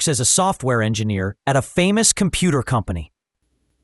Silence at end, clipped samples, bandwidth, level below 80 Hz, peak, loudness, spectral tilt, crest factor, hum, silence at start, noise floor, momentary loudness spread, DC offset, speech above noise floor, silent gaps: 0.8 s; under 0.1%; 12 kHz; -42 dBFS; 0 dBFS; -18 LUFS; -4 dB/octave; 18 dB; none; 0 s; -70 dBFS; 8 LU; under 0.1%; 51 dB; none